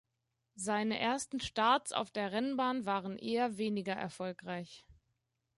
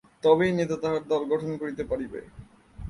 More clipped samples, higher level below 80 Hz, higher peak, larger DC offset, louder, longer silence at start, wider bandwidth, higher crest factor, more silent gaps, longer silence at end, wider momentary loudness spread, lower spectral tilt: neither; second, -70 dBFS vs -50 dBFS; second, -16 dBFS vs -6 dBFS; neither; second, -35 LUFS vs -26 LUFS; first, 0.55 s vs 0.25 s; about the same, 11.5 kHz vs 11 kHz; about the same, 20 dB vs 20 dB; neither; first, 0.65 s vs 0 s; about the same, 12 LU vs 11 LU; second, -4 dB/octave vs -6.5 dB/octave